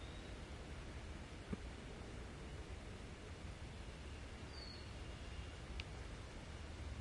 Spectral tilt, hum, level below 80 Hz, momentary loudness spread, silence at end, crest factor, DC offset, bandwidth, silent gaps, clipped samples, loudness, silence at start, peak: -5 dB/octave; none; -54 dBFS; 3 LU; 0 s; 22 dB; under 0.1%; 11.5 kHz; none; under 0.1%; -52 LUFS; 0 s; -28 dBFS